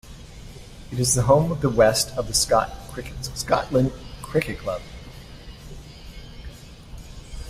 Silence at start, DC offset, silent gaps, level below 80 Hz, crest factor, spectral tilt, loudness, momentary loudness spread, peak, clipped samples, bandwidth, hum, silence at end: 0.05 s; under 0.1%; none; -40 dBFS; 20 dB; -4 dB/octave; -22 LUFS; 24 LU; -4 dBFS; under 0.1%; 16 kHz; none; 0 s